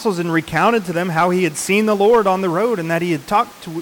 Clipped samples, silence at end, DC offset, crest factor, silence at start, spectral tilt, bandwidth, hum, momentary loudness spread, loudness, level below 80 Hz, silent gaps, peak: under 0.1%; 0 s; under 0.1%; 12 dB; 0 s; -5 dB/octave; 19 kHz; none; 6 LU; -17 LUFS; -52 dBFS; none; -6 dBFS